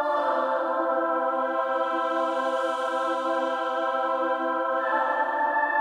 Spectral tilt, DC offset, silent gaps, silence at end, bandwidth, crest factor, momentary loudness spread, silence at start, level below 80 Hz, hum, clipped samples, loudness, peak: -2.5 dB/octave; under 0.1%; none; 0 s; 10.5 kHz; 12 dB; 2 LU; 0 s; -86 dBFS; none; under 0.1%; -26 LUFS; -12 dBFS